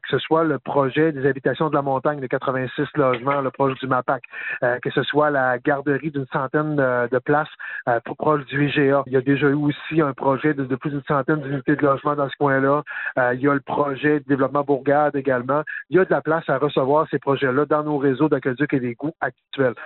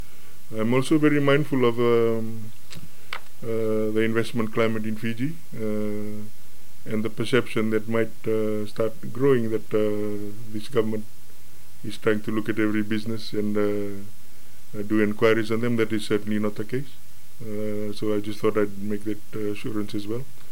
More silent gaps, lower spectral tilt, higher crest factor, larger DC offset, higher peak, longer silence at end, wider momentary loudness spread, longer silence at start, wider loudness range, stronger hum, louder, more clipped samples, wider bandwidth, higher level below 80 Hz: neither; about the same, -5.5 dB/octave vs -6.5 dB/octave; about the same, 16 dB vs 20 dB; second, under 0.1% vs 7%; about the same, -4 dBFS vs -6 dBFS; about the same, 0 s vs 0 s; second, 5 LU vs 16 LU; about the same, 0.05 s vs 0.05 s; second, 2 LU vs 5 LU; neither; first, -21 LUFS vs -26 LUFS; neither; second, 4.2 kHz vs 17 kHz; about the same, -60 dBFS vs -62 dBFS